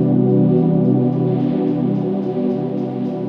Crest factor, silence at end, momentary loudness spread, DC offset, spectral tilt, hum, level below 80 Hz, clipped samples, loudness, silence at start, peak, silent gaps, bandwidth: 12 dB; 0 s; 7 LU; under 0.1%; -12 dB/octave; none; -54 dBFS; under 0.1%; -17 LUFS; 0 s; -4 dBFS; none; 5 kHz